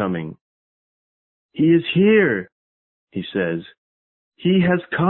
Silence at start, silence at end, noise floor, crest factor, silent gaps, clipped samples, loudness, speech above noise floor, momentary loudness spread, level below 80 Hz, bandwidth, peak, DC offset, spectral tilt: 0 s; 0 s; under -90 dBFS; 16 dB; 0.41-1.49 s, 2.52-3.07 s, 3.78-4.32 s; under 0.1%; -19 LUFS; over 72 dB; 18 LU; -56 dBFS; 4.2 kHz; -4 dBFS; under 0.1%; -12 dB/octave